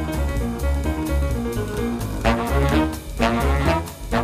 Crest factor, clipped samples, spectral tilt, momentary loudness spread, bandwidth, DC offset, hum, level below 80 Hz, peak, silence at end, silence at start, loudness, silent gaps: 16 dB; under 0.1%; -6 dB/octave; 6 LU; 15.5 kHz; under 0.1%; none; -26 dBFS; -4 dBFS; 0 s; 0 s; -22 LUFS; none